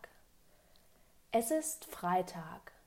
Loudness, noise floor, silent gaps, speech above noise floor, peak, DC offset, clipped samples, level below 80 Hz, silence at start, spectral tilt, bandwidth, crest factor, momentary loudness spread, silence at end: -36 LUFS; -66 dBFS; none; 29 dB; -20 dBFS; under 0.1%; under 0.1%; -70 dBFS; 0 s; -4 dB/octave; 16 kHz; 18 dB; 15 LU; 0.25 s